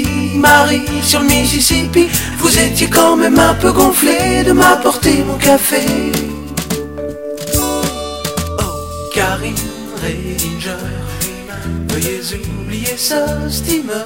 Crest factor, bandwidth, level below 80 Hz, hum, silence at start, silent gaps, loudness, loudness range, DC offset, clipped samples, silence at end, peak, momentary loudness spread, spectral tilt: 14 dB; 19 kHz; -28 dBFS; none; 0 s; none; -13 LUFS; 9 LU; 0.6%; under 0.1%; 0 s; 0 dBFS; 13 LU; -3.5 dB/octave